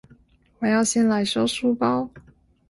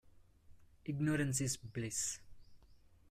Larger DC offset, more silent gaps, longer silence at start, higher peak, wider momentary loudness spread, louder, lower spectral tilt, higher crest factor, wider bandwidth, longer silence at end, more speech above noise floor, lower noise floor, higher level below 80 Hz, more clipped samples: neither; neither; first, 0.6 s vs 0.05 s; first, -6 dBFS vs -24 dBFS; second, 8 LU vs 12 LU; first, -22 LUFS vs -38 LUFS; about the same, -4 dB/octave vs -4 dB/octave; about the same, 16 dB vs 16 dB; second, 11.5 kHz vs 16 kHz; first, 0.5 s vs 0.35 s; first, 34 dB vs 26 dB; second, -56 dBFS vs -63 dBFS; first, -58 dBFS vs -64 dBFS; neither